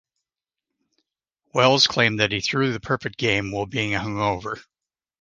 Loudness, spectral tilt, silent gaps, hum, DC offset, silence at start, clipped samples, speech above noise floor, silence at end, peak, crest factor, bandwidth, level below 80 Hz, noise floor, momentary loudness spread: -21 LUFS; -4 dB/octave; none; none; under 0.1%; 1.55 s; under 0.1%; 65 dB; 0.6 s; -2 dBFS; 22 dB; 10 kHz; -52 dBFS; -87 dBFS; 11 LU